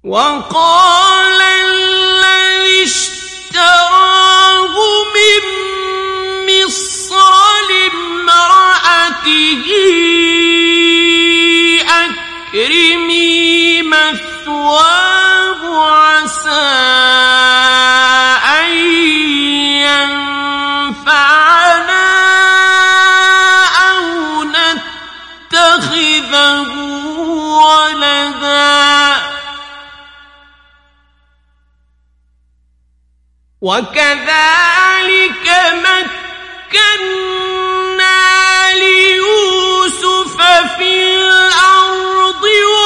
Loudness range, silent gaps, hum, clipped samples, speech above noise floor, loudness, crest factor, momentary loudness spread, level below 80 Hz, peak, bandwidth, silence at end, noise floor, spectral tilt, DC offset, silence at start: 4 LU; none; none; 0.2%; 44 dB; -8 LUFS; 10 dB; 9 LU; -48 dBFS; 0 dBFS; 12 kHz; 0 s; -54 dBFS; -0.5 dB/octave; under 0.1%; 0.05 s